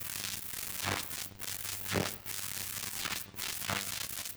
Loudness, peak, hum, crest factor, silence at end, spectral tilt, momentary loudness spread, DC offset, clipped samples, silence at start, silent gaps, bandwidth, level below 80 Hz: -36 LUFS; -16 dBFS; none; 22 dB; 0 s; -2 dB/octave; 4 LU; under 0.1%; under 0.1%; 0 s; none; over 20 kHz; -62 dBFS